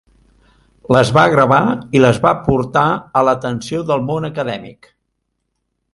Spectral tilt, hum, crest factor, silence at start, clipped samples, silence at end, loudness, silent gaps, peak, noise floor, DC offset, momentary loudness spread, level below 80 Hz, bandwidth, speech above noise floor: -6.5 dB/octave; 60 Hz at -40 dBFS; 16 dB; 0.9 s; under 0.1%; 1.25 s; -15 LUFS; none; 0 dBFS; -72 dBFS; under 0.1%; 11 LU; -44 dBFS; 11.5 kHz; 57 dB